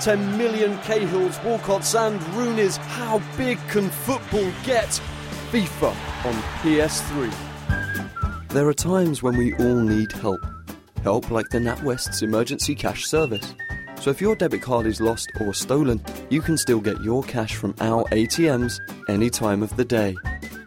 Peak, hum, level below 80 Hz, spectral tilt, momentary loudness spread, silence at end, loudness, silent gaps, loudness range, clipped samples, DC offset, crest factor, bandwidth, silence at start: -8 dBFS; none; -40 dBFS; -5 dB/octave; 7 LU; 0 s; -23 LUFS; none; 2 LU; under 0.1%; under 0.1%; 16 dB; 16.5 kHz; 0 s